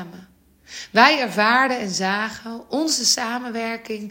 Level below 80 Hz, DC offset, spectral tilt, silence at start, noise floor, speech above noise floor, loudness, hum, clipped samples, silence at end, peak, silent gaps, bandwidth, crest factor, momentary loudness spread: -64 dBFS; under 0.1%; -2 dB/octave; 0 s; -50 dBFS; 30 dB; -19 LUFS; none; under 0.1%; 0 s; 0 dBFS; none; 16.5 kHz; 22 dB; 17 LU